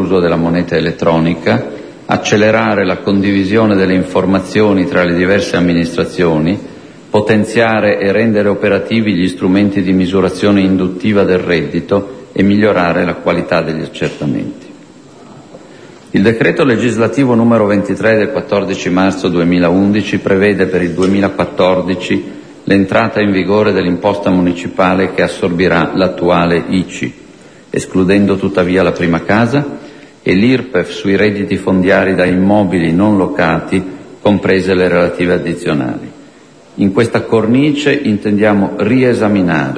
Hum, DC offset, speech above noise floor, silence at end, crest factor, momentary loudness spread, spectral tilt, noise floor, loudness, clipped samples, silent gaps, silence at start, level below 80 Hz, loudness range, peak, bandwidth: none; 0.1%; 28 dB; 0 s; 12 dB; 6 LU; -6.5 dB/octave; -40 dBFS; -12 LUFS; under 0.1%; none; 0 s; -42 dBFS; 2 LU; 0 dBFS; 10.5 kHz